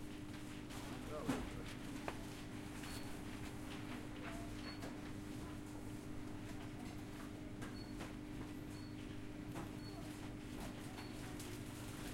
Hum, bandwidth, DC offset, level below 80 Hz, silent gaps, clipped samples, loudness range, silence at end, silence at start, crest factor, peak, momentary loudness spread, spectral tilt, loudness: none; 16.5 kHz; under 0.1%; -58 dBFS; none; under 0.1%; 2 LU; 0 s; 0 s; 24 dB; -24 dBFS; 3 LU; -5 dB/octave; -49 LUFS